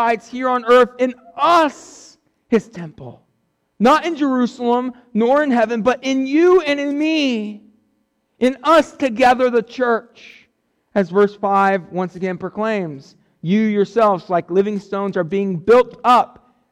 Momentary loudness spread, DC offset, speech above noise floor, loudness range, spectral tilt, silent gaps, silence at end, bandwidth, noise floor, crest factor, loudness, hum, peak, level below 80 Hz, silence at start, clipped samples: 10 LU; under 0.1%; 50 dB; 3 LU; -6 dB/octave; none; 0.45 s; 12.5 kHz; -67 dBFS; 12 dB; -17 LUFS; none; -4 dBFS; -56 dBFS; 0 s; under 0.1%